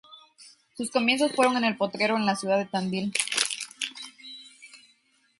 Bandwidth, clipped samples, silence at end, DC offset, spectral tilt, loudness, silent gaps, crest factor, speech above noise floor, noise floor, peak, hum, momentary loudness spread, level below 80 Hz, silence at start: 12 kHz; under 0.1%; 0.65 s; under 0.1%; -3 dB/octave; -26 LUFS; none; 24 dB; 40 dB; -66 dBFS; -4 dBFS; none; 20 LU; -72 dBFS; 0.1 s